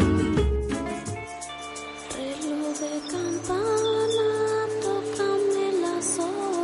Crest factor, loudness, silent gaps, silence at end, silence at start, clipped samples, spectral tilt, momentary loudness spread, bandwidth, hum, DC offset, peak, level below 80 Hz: 16 dB; -27 LUFS; none; 0 s; 0 s; under 0.1%; -5 dB/octave; 11 LU; 11.5 kHz; none; under 0.1%; -8 dBFS; -38 dBFS